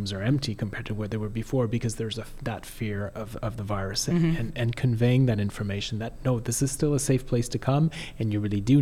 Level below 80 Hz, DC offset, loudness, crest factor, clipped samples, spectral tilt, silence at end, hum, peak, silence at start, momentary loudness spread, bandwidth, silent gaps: -42 dBFS; under 0.1%; -27 LUFS; 16 dB; under 0.1%; -6 dB/octave; 0 s; none; -10 dBFS; 0 s; 10 LU; 15.5 kHz; none